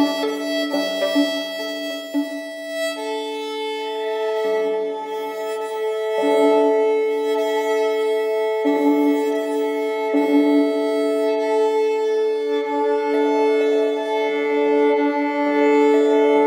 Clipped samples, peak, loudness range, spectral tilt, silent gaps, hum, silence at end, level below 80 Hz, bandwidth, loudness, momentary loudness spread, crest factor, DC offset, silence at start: under 0.1%; -6 dBFS; 6 LU; -3.5 dB/octave; none; none; 0 s; -90 dBFS; 16 kHz; -20 LUFS; 10 LU; 14 dB; under 0.1%; 0 s